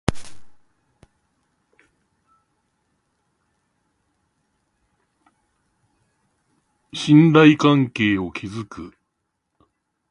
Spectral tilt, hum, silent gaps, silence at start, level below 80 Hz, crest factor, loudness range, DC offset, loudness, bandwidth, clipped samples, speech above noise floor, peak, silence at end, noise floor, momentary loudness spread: -6.5 dB/octave; none; none; 0.1 s; -48 dBFS; 22 dB; 4 LU; under 0.1%; -16 LUFS; 11 kHz; under 0.1%; 60 dB; 0 dBFS; 1.2 s; -76 dBFS; 23 LU